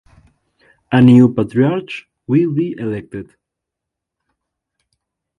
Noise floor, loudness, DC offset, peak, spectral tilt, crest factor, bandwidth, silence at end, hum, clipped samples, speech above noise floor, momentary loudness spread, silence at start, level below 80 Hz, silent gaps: -82 dBFS; -14 LUFS; under 0.1%; 0 dBFS; -9 dB/octave; 18 dB; 4.5 kHz; 2.15 s; none; under 0.1%; 68 dB; 21 LU; 0.9 s; -52 dBFS; none